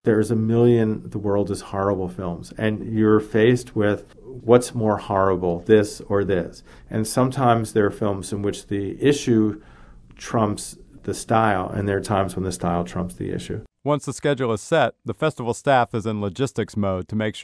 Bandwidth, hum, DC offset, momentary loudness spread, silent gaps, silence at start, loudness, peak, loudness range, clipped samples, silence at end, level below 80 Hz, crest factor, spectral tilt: 11 kHz; none; under 0.1%; 11 LU; none; 0.05 s; -22 LUFS; 0 dBFS; 4 LU; under 0.1%; 0 s; -48 dBFS; 20 dB; -6.5 dB/octave